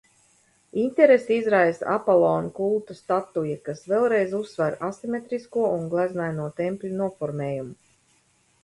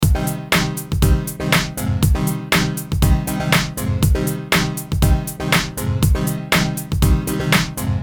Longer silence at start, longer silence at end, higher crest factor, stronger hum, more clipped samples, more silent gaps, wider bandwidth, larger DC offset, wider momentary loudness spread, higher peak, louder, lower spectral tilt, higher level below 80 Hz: first, 0.75 s vs 0 s; first, 0.9 s vs 0 s; about the same, 20 dB vs 18 dB; neither; neither; neither; second, 11.5 kHz vs 19.5 kHz; second, under 0.1% vs 0.2%; first, 11 LU vs 4 LU; second, -4 dBFS vs 0 dBFS; second, -24 LUFS vs -18 LUFS; first, -7.5 dB/octave vs -4.5 dB/octave; second, -66 dBFS vs -24 dBFS